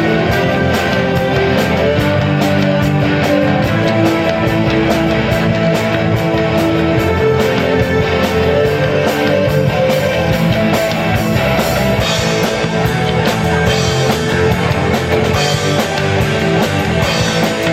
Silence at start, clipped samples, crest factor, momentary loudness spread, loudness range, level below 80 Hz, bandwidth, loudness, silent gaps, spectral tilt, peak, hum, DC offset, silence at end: 0 s; under 0.1%; 12 dB; 1 LU; 1 LU; -30 dBFS; 16.5 kHz; -13 LUFS; none; -5.5 dB/octave; 0 dBFS; none; under 0.1%; 0 s